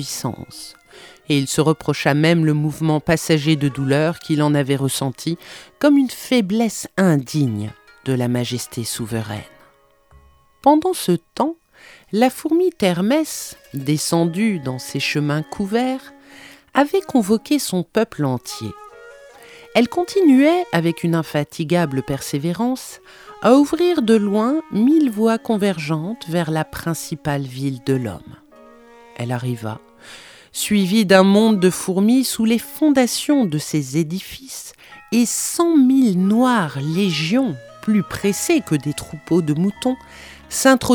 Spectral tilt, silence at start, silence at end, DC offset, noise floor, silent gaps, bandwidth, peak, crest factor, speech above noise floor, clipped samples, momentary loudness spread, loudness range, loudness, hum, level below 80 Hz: -5.5 dB/octave; 0 s; 0 s; under 0.1%; -54 dBFS; none; over 20 kHz; 0 dBFS; 18 dB; 36 dB; under 0.1%; 14 LU; 5 LU; -18 LUFS; none; -54 dBFS